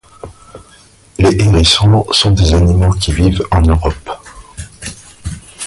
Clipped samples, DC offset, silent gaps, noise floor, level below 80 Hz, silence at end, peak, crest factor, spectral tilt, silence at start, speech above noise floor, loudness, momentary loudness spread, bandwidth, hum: under 0.1%; under 0.1%; none; -44 dBFS; -20 dBFS; 0 s; 0 dBFS; 12 dB; -5.5 dB/octave; 0.25 s; 34 dB; -11 LUFS; 21 LU; 11.5 kHz; none